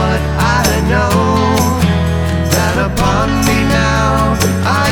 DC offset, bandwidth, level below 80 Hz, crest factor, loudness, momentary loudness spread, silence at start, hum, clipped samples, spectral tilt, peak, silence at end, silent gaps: under 0.1%; 19 kHz; -24 dBFS; 12 dB; -13 LUFS; 2 LU; 0 s; none; under 0.1%; -5 dB/octave; 0 dBFS; 0 s; none